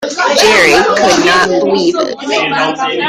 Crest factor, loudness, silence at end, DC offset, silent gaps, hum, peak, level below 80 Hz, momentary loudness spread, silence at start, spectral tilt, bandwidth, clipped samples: 10 dB; -9 LUFS; 0 s; under 0.1%; none; none; 0 dBFS; -44 dBFS; 7 LU; 0 s; -2.5 dB/octave; 16 kHz; under 0.1%